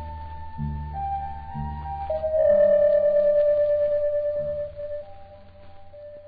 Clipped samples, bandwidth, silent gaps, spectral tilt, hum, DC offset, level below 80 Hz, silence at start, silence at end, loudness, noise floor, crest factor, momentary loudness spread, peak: under 0.1%; 4.7 kHz; none; -11 dB/octave; none; under 0.1%; -42 dBFS; 0 s; 0 s; -23 LUFS; -45 dBFS; 14 dB; 18 LU; -10 dBFS